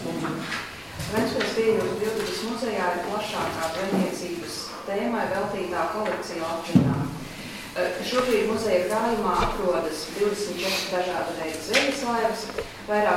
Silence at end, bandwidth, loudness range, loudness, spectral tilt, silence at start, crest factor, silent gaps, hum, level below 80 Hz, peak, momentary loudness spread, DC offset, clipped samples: 0 s; 16.5 kHz; 3 LU; -26 LUFS; -4.5 dB/octave; 0 s; 20 dB; none; none; -48 dBFS; -6 dBFS; 9 LU; under 0.1%; under 0.1%